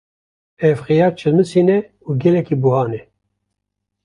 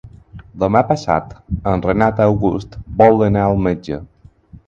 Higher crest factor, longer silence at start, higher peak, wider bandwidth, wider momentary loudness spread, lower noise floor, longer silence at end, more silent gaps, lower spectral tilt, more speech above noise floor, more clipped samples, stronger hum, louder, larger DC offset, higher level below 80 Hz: about the same, 16 dB vs 16 dB; first, 0.6 s vs 0.05 s; about the same, -2 dBFS vs 0 dBFS; first, 11 kHz vs 7.6 kHz; second, 7 LU vs 14 LU; first, -77 dBFS vs -43 dBFS; first, 1.05 s vs 0.65 s; neither; about the same, -8.5 dB/octave vs -8.5 dB/octave; first, 62 dB vs 28 dB; neither; neither; about the same, -16 LUFS vs -16 LUFS; neither; second, -56 dBFS vs -36 dBFS